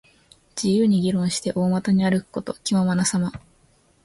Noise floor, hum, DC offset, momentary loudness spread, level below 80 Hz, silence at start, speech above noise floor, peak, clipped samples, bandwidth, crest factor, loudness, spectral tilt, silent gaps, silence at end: -59 dBFS; none; under 0.1%; 9 LU; -54 dBFS; 0.55 s; 38 dB; -8 dBFS; under 0.1%; 11.5 kHz; 14 dB; -22 LUFS; -5.5 dB/octave; none; 0.65 s